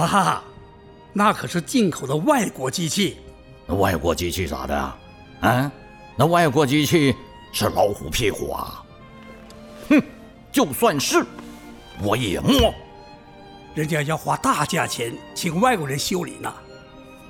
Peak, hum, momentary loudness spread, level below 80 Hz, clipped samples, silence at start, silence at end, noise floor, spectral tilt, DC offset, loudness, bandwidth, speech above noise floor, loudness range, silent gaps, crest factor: -4 dBFS; none; 21 LU; -42 dBFS; under 0.1%; 0 s; 0 s; -45 dBFS; -4.5 dB/octave; under 0.1%; -21 LUFS; 19.5 kHz; 25 dB; 3 LU; none; 18 dB